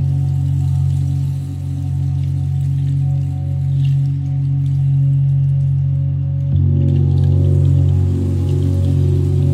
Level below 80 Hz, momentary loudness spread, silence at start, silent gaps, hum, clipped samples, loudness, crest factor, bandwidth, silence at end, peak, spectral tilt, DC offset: -36 dBFS; 5 LU; 0 s; none; none; under 0.1%; -16 LUFS; 10 dB; 4.1 kHz; 0 s; -4 dBFS; -10 dB/octave; under 0.1%